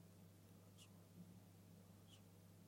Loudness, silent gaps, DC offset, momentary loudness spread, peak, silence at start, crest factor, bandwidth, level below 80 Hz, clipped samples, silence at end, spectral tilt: -65 LUFS; none; under 0.1%; 3 LU; -52 dBFS; 0 s; 14 dB; 16.5 kHz; -88 dBFS; under 0.1%; 0 s; -5.5 dB/octave